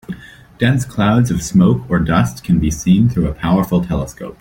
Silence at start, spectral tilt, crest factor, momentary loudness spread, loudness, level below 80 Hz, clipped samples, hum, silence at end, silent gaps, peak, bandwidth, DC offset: 0.1 s; -6.5 dB/octave; 14 dB; 8 LU; -15 LUFS; -32 dBFS; under 0.1%; none; 0.05 s; none; 0 dBFS; 17 kHz; under 0.1%